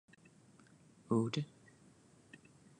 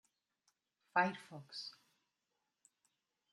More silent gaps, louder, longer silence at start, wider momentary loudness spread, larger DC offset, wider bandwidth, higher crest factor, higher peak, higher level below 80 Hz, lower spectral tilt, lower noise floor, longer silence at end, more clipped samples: neither; about the same, -38 LUFS vs -39 LUFS; first, 1.1 s vs 0.95 s; first, 25 LU vs 16 LU; neither; second, 10.5 kHz vs 12 kHz; about the same, 22 dB vs 26 dB; about the same, -22 dBFS vs -20 dBFS; first, -80 dBFS vs under -90 dBFS; first, -6.5 dB/octave vs -4.5 dB/octave; second, -65 dBFS vs -88 dBFS; second, 1.35 s vs 1.6 s; neither